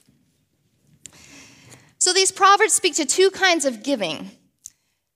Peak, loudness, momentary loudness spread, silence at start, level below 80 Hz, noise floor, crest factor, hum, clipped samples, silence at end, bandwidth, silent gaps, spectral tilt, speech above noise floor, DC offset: -2 dBFS; -18 LUFS; 10 LU; 2 s; -70 dBFS; -66 dBFS; 20 dB; none; under 0.1%; 0.85 s; 16 kHz; none; -0.5 dB/octave; 47 dB; under 0.1%